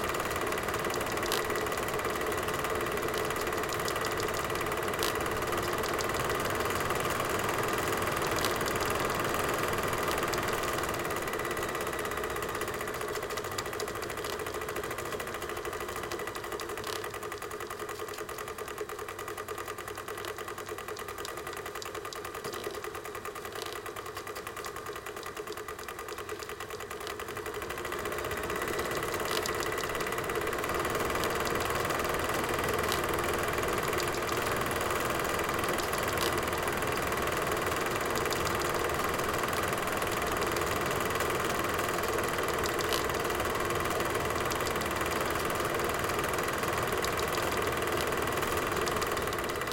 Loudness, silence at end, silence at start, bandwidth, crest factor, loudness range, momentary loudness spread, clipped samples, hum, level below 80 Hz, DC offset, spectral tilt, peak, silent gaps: -32 LUFS; 0 s; 0 s; 17 kHz; 24 dB; 8 LU; 9 LU; under 0.1%; none; -50 dBFS; under 0.1%; -3.5 dB/octave; -8 dBFS; none